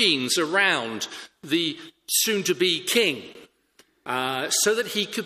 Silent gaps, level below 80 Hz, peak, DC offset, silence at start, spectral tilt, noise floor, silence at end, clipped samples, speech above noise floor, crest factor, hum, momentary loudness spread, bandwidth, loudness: none; -72 dBFS; -6 dBFS; under 0.1%; 0 s; -1.5 dB/octave; -61 dBFS; 0 s; under 0.1%; 37 dB; 20 dB; none; 13 LU; 15.5 kHz; -23 LUFS